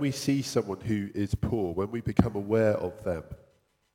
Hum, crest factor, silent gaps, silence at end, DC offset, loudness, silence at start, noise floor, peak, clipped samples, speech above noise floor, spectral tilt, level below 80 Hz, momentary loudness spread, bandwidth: none; 26 dB; none; 0.6 s; under 0.1%; -29 LUFS; 0 s; -67 dBFS; -2 dBFS; under 0.1%; 39 dB; -6.5 dB/octave; -46 dBFS; 9 LU; 16.5 kHz